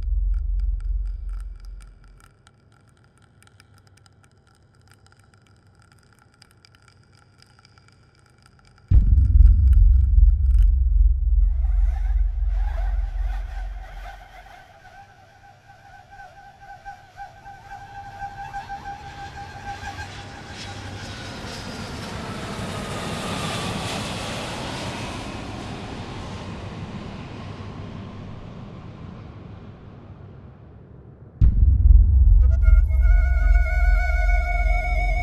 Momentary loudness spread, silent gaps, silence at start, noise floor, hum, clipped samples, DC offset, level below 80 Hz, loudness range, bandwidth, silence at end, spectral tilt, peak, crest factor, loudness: 25 LU; none; 0 s; -56 dBFS; none; under 0.1%; under 0.1%; -22 dBFS; 21 LU; 10.5 kHz; 0 s; -6 dB/octave; -2 dBFS; 20 dB; -23 LUFS